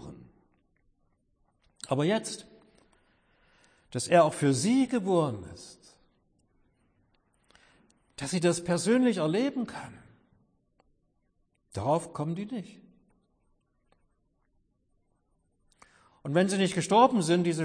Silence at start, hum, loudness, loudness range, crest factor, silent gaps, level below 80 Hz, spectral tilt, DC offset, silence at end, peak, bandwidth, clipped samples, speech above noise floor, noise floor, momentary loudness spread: 0 s; none; -27 LUFS; 8 LU; 22 dB; none; -68 dBFS; -5.5 dB/octave; under 0.1%; 0 s; -8 dBFS; 10.5 kHz; under 0.1%; 46 dB; -73 dBFS; 21 LU